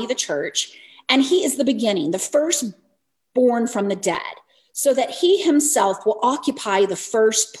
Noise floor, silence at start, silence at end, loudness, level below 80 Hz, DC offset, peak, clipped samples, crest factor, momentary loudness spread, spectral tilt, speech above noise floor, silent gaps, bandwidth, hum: -69 dBFS; 0 s; 0 s; -20 LUFS; -70 dBFS; under 0.1%; -2 dBFS; under 0.1%; 18 dB; 8 LU; -2.5 dB/octave; 50 dB; none; 14 kHz; none